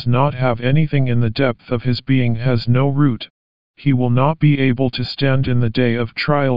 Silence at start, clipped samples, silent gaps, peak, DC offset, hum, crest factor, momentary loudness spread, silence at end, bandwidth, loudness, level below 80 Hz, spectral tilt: 0 s; under 0.1%; 3.30-3.74 s; -2 dBFS; 4%; none; 14 dB; 5 LU; 0 s; 5.4 kHz; -17 LUFS; -44 dBFS; -10 dB/octave